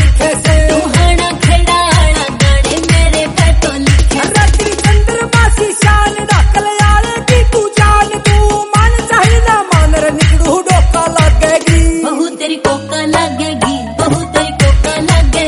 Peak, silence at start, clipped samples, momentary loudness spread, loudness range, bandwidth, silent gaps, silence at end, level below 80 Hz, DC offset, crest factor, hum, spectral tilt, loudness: 0 dBFS; 0 s; 0.5%; 5 LU; 3 LU; 11.5 kHz; none; 0 s; -12 dBFS; under 0.1%; 8 dB; none; -4.5 dB/octave; -10 LUFS